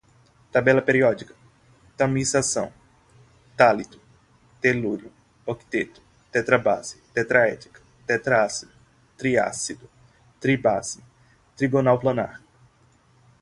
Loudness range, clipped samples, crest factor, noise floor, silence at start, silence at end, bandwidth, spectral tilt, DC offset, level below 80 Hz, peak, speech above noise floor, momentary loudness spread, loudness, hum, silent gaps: 2 LU; under 0.1%; 22 dB; -59 dBFS; 0.55 s; 1.05 s; 11.5 kHz; -4.5 dB/octave; under 0.1%; -58 dBFS; -2 dBFS; 37 dB; 15 LU; -23 LUFS; none; none